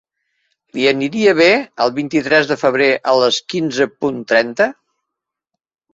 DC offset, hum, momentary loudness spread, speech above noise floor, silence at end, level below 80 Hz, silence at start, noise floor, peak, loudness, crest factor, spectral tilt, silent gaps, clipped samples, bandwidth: under 0.1%; none; 7 LU; 66 dB; 1.2 s; -60 dBFS; 0.75 s; -81 dBFS; 0 dBFS; -15 LUFS; 16 dB; -4 dB/octave; none; under 0.1%; 8 kHz